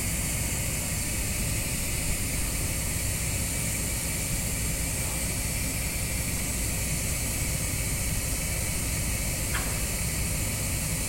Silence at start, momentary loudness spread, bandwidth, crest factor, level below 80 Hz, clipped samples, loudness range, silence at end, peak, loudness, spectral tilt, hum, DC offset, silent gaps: 0 s; 1 LU; 16.5 kHz; 16 dB; -34 dBFS; under 0.1%; 0 LU; 0 s; -14 dBFS; -28 LUFS; -3 dB/octave; none; under 0.1%; none